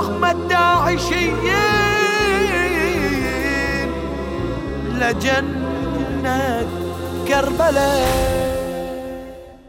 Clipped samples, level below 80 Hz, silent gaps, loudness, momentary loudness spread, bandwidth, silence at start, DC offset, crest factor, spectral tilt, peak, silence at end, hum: under 0.1%; -32 dBFS; none; -19 LUFS; 10 LU; 16.5 kHz; 0 s; under 0.1%; 14 dB; -4.5 dB/octave; -4 dBFS; 0 s; none